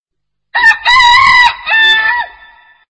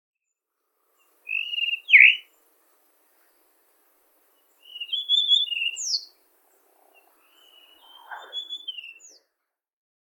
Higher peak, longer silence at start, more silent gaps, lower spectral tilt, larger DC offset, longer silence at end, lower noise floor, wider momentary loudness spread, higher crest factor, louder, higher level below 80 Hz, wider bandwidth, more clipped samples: about the same, 0 dBFS vs -2 dBFS; second, 0.55 s vs 1.25 s; neither; first, 0.5 dB/octave vs 8 dB/octave; neither; second, 0.6 s vs 1.15 s; second, -73 dBFS vs -83 dBFS; second, 13 LU vs 29 LU; second, 10 dB vs 26 dB; first, -6 LUFS vs -19 LUFS; first, -40 dBFS vs under -90 dBFS; second, 11 kHz vs 18 kHz; first, 0.5% vs under 0.1%